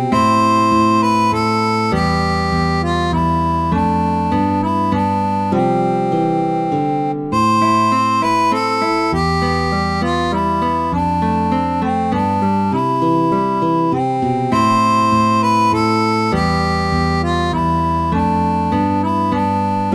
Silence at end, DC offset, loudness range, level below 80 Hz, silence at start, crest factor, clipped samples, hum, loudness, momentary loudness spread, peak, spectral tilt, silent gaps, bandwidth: 0 s; 0.3%; 2 LU; -34 dBFS; 0 s; 12 dB; under 0.1%; none; -16 LUFS; 4 LU; -4 dBFS; -6.5 dB/octave; none; 13.5 kHz